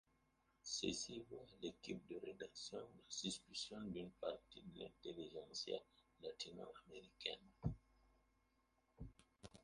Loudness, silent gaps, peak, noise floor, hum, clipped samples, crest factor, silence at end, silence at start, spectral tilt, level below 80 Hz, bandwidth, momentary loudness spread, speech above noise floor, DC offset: -51 LUFS; none; -28 dBFS; -82 dBFS; none; under 0.1%; 24 dB; 0 s; 0.65 s; -3.5 dB/octave; -70 dBFS; 11 kHz; 13 LU; 31 dB; under 0.1%